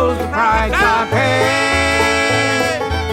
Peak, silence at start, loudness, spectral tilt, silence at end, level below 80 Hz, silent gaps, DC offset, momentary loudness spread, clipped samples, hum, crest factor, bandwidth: 0 dBFS; 0 s; -14 LUFS; -4 dB/octave; 0 s; -30 dBFS; none; under 0.1%; 3 LU; under 0.1%; none; 14 dB; 16.5 kHz